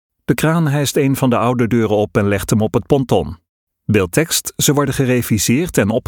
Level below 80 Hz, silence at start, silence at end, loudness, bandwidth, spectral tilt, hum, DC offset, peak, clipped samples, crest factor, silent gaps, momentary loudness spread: -40 dBFS; 0.3 s; 0.1 s; -16 LUFS; 19 kHz; -5 dB/octave; none; under 0.1%; 0 dBFS; under 0.1%; 16 dB; 3.49-3.67 s; 3 LU